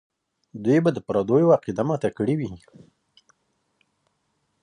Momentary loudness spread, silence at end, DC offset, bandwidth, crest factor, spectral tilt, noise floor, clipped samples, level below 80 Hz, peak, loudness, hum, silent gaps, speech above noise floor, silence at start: 10 LU; 2.05 s; under 0.1%; 10 kHz; 20 dB; -8.5 dB/octave; -73 dBFS; under 0.1%; -60 dBFS; -6 dBFS; -22 LUFS; none; none; 51 dB; 0.55 s